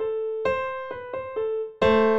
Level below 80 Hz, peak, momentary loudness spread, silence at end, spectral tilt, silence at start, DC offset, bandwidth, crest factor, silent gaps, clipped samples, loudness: -52 dBFS; -8 dBFS; 12 LU; 0 s; -6.5 dB/octave; 0 s; under 0.1%; 7.8 kHz; 16 dB; none; under 0.1%; -26 LUFS